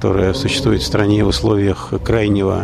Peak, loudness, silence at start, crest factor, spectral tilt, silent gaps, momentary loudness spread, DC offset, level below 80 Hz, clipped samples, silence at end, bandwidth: -2 dBFS; -16 LUFS; 0 s; 12 dB; -6 dB/octave; none; 4 LU; under 0.1%; -30 dBFS; under 0.1%; 0 s; 13.5 kHz